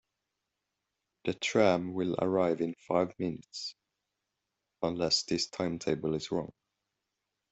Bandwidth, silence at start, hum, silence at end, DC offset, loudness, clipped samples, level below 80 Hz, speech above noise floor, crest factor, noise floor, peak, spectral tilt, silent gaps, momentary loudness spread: 8.2 kHz; 1.25 s; none; 1.05 s; under 0.1%; -32 LUFS; under 0.1%; -68 dBFS; 55 dB; 22 dB; -86 dBFS; -12 dBFS; -4.5 dB/octave; none; 12 LU